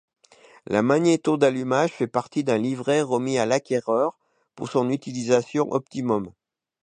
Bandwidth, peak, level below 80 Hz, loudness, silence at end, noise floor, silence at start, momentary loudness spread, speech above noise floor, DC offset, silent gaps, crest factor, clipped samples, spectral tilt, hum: 9.8 kHz; -4 dBFS; -66 dBFS; -23 LUFS; 0.55 s; -53 dBFS; 0.7 s; 7 LU; 31 dB; under 0.1%; none; 20 dB; under 0.1%; -5.5 dB/octave; none